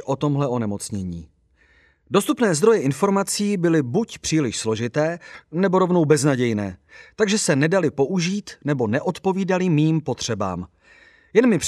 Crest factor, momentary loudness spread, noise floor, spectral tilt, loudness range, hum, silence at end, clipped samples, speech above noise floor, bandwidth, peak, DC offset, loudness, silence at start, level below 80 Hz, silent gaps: 18 dB; 10 LU; -58 dBFS; -5.5 dB/octave; 2 LU; none; 0 s; under 0.1%; 38 dB; 14 kHz; -2 dBFS; under 0.1%; -21 LUFS; 0 s; -56 dBFS; none